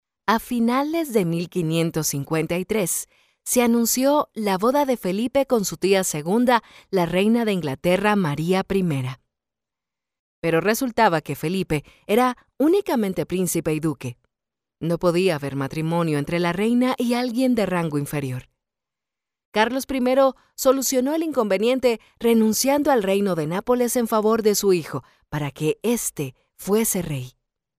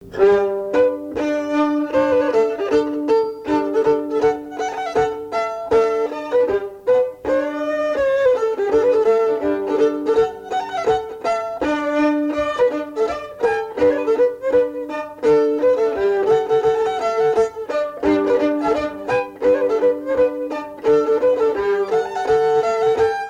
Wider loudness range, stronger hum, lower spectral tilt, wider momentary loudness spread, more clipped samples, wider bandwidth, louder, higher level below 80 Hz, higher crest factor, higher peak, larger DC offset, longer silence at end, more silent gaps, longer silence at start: about the same, 4 LU vs 2 LU; neither; about the same, -5 dB/octave vs -5.5 dB/octave; about the same, 8 LU vs 6 LU; neither; first, 16 kHz vs 9.4 kHz; second, -22 LUFS vs -19 LUFS; about the same, -54 dBFS vs -50 dBFS; about the same, 16 dB vs 14 dB; about the same, -4 dBFS vs -4 dBFS; neither; first, 0.5 s vs 0 s; first, 10.19-10.42 s, 19.45-19.52 s vs none; first, 0.3 s vs 0 s